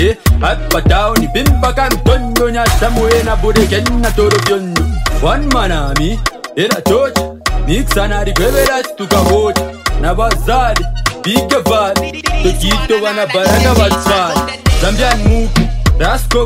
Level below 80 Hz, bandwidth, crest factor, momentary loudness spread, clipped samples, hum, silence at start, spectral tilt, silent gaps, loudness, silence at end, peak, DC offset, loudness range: -16 dBFS; 16.5 kHz; 12 dB; 5 LU; under 0.1%; none; 0 s; -5 dB/octave; none; -13 LUFS; 0 s; 0 dBFS; under 0.1%; 2 LU